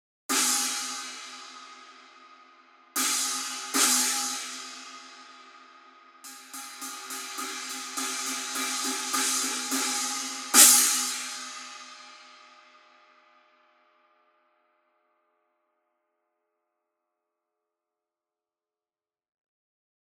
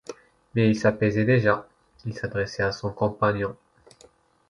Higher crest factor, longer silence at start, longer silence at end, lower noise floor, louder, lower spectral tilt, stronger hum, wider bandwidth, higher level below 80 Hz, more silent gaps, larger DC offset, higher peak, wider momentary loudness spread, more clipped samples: first, 30 dB vs 20 dB; first, 0.3 s vs 0.1 s; first, 7.55 s vs 0.95 s; first, under -90 dBFS vs -57 dBFS; about the same, -24 LUFS vs -24 LUFS; second, 3 dB/octave vs -7 dB/octave; neither; first, 17 kHz vs 10.5 kHz; second, under -90 dBFS vs -52 dBFS; neither; neither; about the same, -2 dBFS vs -4 dBFS; first, 23 LU vs 12 LU; neither